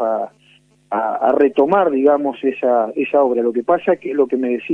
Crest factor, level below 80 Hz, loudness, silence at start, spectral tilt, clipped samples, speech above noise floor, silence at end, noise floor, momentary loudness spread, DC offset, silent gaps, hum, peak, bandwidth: 14 dB; -62 dBFS; -17 LUFS; 0 s; -8 dB/octave; under 0.1%; 37 dB; 0 s; -53 dBFS; 7 LU; under 0.1%; none; none; -2 dBFS; 3.8 kHz